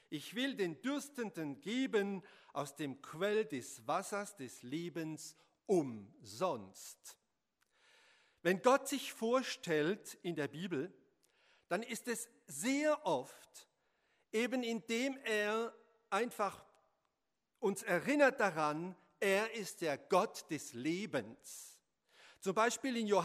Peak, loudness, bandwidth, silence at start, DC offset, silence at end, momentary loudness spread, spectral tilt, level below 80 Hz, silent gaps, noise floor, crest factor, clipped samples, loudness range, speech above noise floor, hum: -16 dBFS; -38 LUFS; 15.5 kHz; 0.1 s; under 0.1%; 0 s; 15 LU; -4 dB/octave; -88 dBFS; none; -87 dBFS; 24 dB; under 0.1%; 5 LU; 49 dB; none